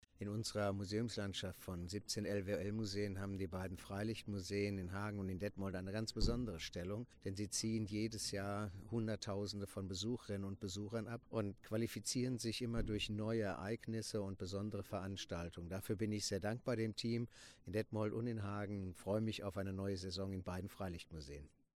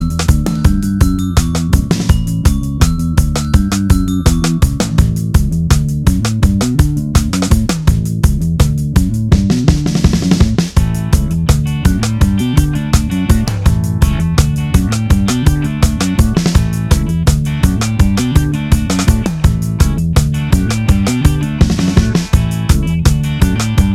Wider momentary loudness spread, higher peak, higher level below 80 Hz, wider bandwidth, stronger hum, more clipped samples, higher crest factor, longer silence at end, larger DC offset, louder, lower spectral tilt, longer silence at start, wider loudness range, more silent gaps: first, 6 LU vs 2 LU; second, -22 dBFS vs 0 dBFS; second, -56 dBFS vs -16 dBFS; about the same, 15.5 kHz vs 16 kHz; neither; second, under 0.1% vs 0.3%; first, 22 dB vs 12 dB; first, 0.3 s vs 0 s; neither; second, -43 LUFS vs -13 LUFS; about the same, -5 dB/octave vs -6 dB/octave; first, 0.2 s vs 0 s; about the same, 2 LU vs 1 LU; neither